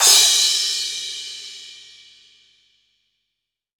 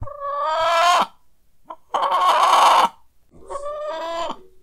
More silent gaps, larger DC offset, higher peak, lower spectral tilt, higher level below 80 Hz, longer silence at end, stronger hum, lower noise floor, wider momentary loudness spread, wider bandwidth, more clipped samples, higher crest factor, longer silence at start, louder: neither; neither; about the same, 0 dBFS vs -2 dBFS; second, 4 dB/octave vs -1.5 dB/octave; second, -66 dBFS vs -52 dBFS; first, 2.05 s vs 0.2 s; first, 50 Hz at -75 dBFS vs none; first, -81 dBFS vs -51 dBFS; first, 25 LU vs 16 LU; first, over 20 kHz vs 16 kHz; neither; about the same, 22 dB vs 18 dB; about the same, 0 s vs 0 s; about the same, -16 LUFS vs -18 LUFS